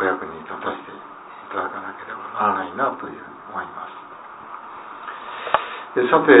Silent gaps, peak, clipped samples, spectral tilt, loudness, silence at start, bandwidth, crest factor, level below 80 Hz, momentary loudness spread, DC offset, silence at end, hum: none; 0 dBFS; under 0.1%; -9 dB/octave; -24 LUFS; 0 s; 4 kHz; 22 dB; -64 dBFS; 16 LU; under 0.1%; 0 s; none